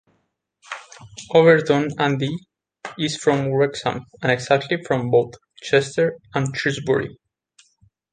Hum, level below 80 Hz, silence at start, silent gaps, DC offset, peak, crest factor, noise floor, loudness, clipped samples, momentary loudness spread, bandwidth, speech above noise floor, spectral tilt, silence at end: none; -60 dBFS; 0.7 s; none; under 0.1%; -2 dBFS; 20 dB; -70 dBFS; -20 LUFS; under 0.1%; 19 LU; 9.6 kHz; 50 dB; -5.5 dB/octave; 1 s